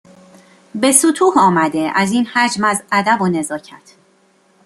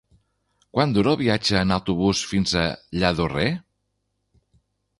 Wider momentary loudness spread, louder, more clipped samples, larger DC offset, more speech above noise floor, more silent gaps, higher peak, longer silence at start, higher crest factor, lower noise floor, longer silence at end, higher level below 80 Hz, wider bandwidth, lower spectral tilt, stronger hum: first, 10 LU vs 6 LU; first, -14 LUFS vs -22 LUFS; neither; neither; second, 40 dB vs 53 dB; neither; first, 0 dBFS vs -4 dBFS; about the same, 0.75 s vs 0.75 s; about the same, 16 dB vs 20 dB; second, -55 dBFS vs -74 dBFS; second, 0.9 s vs 1.4 s; second, -60 dBFS vs -44 dBFS; first, 15.5 kHz vs 11.5 kHz; second, -3.5 dB/octave vs -5 dB/octave; second, none vs 50 Hz at -50 dBFS